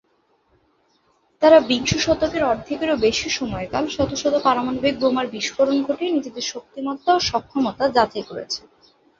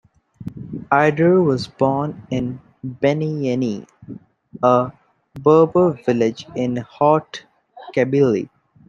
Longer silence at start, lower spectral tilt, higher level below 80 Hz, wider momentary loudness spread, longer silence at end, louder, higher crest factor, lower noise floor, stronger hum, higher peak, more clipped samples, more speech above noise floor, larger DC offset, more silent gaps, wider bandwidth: first, 1.4 s vs 0.4 s; second, -4 dB/octave vs -7.5 dB/octave; first, -48 dBFS vs -56 dBFS; second, 11 LU vs 21 LU; first, 0.6 s vs 0.4 s; about the same, -20 LUFS vs -18 LUFS; about the same, 20 dB vs 18 dB; first, -64 dBFS vs -39 dBFS; neither; about the same, -2 dBFS vs -2 dBFS; neither; first, 44 dB vs 21 dB; neither; neither; second, 7.6 kHz vs 8.8 kHz